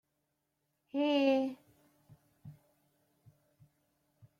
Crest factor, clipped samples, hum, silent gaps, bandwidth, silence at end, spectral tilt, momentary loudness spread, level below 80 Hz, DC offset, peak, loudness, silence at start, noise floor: 22 dB; under 0.1%; none; none; 7 kHz; 1.9 s; -6 dB/octave; 27 LU; -82 dBFS; under 0.1%; -18 dBFS; -32 LUFS; 0.95 s; -83 dBFS